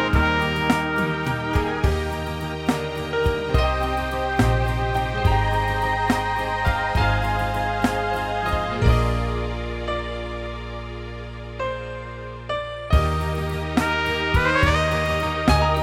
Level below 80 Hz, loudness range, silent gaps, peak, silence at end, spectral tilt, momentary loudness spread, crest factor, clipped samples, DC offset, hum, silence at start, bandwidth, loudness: -30 dBFS; 6 LU; none; -4 dBFS; 0 s; -6 dB/octave; 11 LU; 18 dB; under 0.1%; under 0.1%; none; 0 s; 16.5 kHz; -23 LUFS